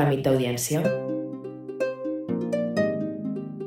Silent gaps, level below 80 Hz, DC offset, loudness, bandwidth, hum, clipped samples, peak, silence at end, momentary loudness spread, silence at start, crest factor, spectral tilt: none; -60 dBFS; under 0.1%; -27 LUFS; 16 kHz; none; under 0.1%; -10 dBFS; 0 s; 9 LU; 0 s; 16 dB; -5.5 dB/octave